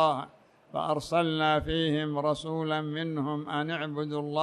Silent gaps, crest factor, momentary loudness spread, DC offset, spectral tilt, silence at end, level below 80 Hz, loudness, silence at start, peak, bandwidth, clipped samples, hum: none; 18 dB; 7 LU; under 0.1%; -6 dB/octave; 0 s; -54 dBFS; -30 LUFS; 0 s; -10 dBFS; 12.5 kHz; under 0.1%; none